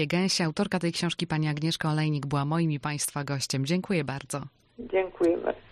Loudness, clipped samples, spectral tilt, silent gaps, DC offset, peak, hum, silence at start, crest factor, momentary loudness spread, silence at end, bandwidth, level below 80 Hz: -28 LUFS; under 0.1%; -5 dB/octave; none; under 0.1%; -12 dBFS; none; 0 s; 16 dB; 7 LU; 0.1 s; 14.5 kHz; -60 dBFS